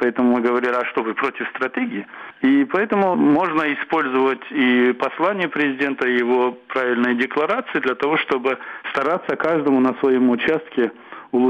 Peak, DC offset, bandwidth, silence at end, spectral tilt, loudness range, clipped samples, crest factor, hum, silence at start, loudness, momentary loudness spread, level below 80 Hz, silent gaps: -6 dBFS; under 0.1%; 6.6 kHz; 0 s; -7 dB/octave; 2 LU; under 0.1%; 14 dB; none; 0 s; -19 LUFS; 7 LU; -64 dBFS; none